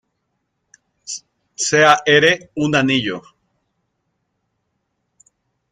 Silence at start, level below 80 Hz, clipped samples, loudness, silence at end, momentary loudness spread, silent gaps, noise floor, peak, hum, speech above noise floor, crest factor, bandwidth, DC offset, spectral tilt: 1.1 s; -60 dBFS; under 0.1%; -15 LUFS; 2.5 s; 18 LU; none; -72 dBFS; 0 dBFS; none; 57 dB; 20 dB; 12 kHz; under 0.1%; -3.5 dB/octave